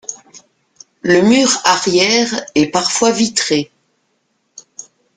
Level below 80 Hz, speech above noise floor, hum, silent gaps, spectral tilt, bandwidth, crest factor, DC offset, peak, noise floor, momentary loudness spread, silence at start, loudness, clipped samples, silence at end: -56 dBFS; 52 dB; none; none; -3 dB/octave; 11 kHz; 16 dB; under 0.1%; 0 dBFS; -65 dBFS; 23 LU; 0.1 s; -13 LUFS; under 0.1%; 0.35 s